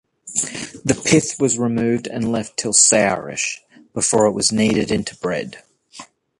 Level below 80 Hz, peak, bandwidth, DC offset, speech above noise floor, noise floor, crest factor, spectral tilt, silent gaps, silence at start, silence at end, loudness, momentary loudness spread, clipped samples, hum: -50 dBFS; 0 dBFS; 11.5 kHz; under 0.1%; 24 dB; -42 dBFS; 20 dB; -3 dB/octave; none; 0.25 s; 0.35 s; -18 LUFS; 12 LU; under 0.1%; none